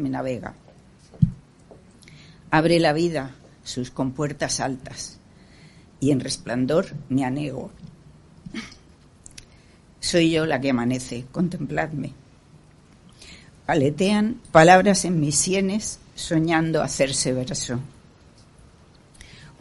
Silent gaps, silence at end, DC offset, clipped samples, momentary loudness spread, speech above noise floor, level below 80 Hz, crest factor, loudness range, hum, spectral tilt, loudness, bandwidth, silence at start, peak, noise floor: none; 0.15 s; under 0.1%; under 0.1%; 18 LU; 30 dB; -50 dBFS; 24 dB; 9 LU; none; -4.5 dB/octave; -22 LUFS; 11.5 kHz; 0 s; 0 dBFS; -52 dBFS